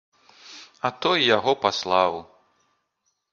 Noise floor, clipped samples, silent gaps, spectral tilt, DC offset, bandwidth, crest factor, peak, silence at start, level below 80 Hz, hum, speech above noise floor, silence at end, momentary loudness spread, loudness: -75 dBFS; under 0.1%; none; -3.5 dB/octave; under 0.1%; 7.4 kHz; 22 dB; -4 dBFS; 0.45 s; -64 dBFS; none; 53 dB; 1.1 s; 24 LU; -22 LUFS